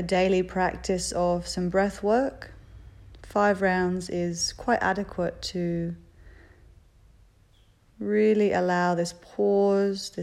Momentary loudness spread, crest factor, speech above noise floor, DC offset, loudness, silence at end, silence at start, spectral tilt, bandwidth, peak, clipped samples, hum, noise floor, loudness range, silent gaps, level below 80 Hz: 9 LU; 16 dB; 34 dB; under 0.1%; -26 LUFS; 0 s; 0 s; -5 dB/octave; 14 kHz; -10 dBFS; under 0.1%; none; -59 dBFS; 5 LU; none; -50 dBFS